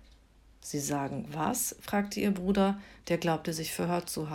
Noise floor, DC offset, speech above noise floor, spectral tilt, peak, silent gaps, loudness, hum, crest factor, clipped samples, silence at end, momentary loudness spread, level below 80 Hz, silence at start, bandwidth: -59 dBFS; under 0.1%; 28 dB; -4.5 dB/octave; -16 dBFS; none; -32 LUFS; none; 16 dB; under 0.1%; 0 s; 7 LU; -58 dBFS; 0.6 s; 17 kHz